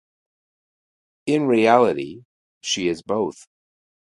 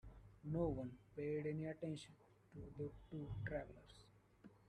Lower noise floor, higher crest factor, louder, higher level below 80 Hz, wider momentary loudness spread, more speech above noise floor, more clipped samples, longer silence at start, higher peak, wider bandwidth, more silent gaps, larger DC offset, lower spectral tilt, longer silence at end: first, under -90 dBFS vs -67 dBFS; about the same, 22 dB vs 20 dB; first, -20 LUFS vs -48 LUFS; about the same, -64 dBFS vs -64 dBFS; second, 17 LU vs 20 LU; first, over 70 dB vs 20 dB; neither; first, 1.25 s vs 0.05 s; first, -2 dBFS vs -30 dBFS; about the same, 11.5 kHz vs 10.5 kHz; first, 2.25-2.61 s vs none; neither; second, -4.5 dB/octave vs -8 dB/octave; first, 0.85 s vs 0 s